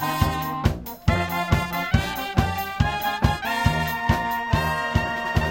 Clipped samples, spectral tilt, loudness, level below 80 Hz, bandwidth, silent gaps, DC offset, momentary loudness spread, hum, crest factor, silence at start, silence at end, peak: under 0.1%; -5.5 dB/octave; -24 LUFS; -32 dBFS; 17 kHz; none; under 0.1%; 2 LU; none; 20 dB; 0 s; 0 s; -2 dBFS